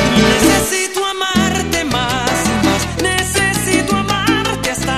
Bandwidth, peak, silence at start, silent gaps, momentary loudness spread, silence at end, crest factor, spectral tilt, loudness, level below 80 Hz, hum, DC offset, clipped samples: 14 kHz; 0 dBFS; 0 s; none; 5 LU; 0 s; 14 dB; -3.5 dB/octave; -14 LUFS; -32 dBFS; none; 0.5%; under 0.1%